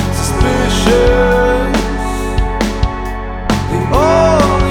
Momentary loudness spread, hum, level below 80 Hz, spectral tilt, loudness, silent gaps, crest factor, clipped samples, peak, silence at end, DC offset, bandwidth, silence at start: 9 LU; none; -18 dBFS; -5.5 dB/octave; -13 LUFS; none; 12 dB; under 0.1%; 0 dBFS; 0 s; under 0.1%; 17 kHz; 0 s